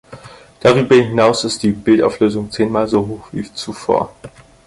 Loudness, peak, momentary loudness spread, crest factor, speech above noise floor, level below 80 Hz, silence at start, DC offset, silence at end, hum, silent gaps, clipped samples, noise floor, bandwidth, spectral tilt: -15 LUFS; 0 dBFS; 14 LU; 16 dB; 24 dB; -46 dBFS; 0.1 s; under 0.1%; 0.4 s; none; none; under 0.1%; -39 dBFS; 11.5 kHz; -5.5 dB/octave